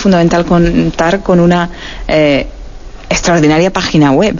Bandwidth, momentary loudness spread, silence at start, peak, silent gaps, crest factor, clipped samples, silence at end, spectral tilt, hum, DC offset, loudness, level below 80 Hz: 7.4 kHz; 7 LU; 0 s; 0 dBFS; none; 10 dB; under 0.1%; 0 s; -5.5 dB/octave; none; under 0.1%; -10 LUFS; -26 dBFS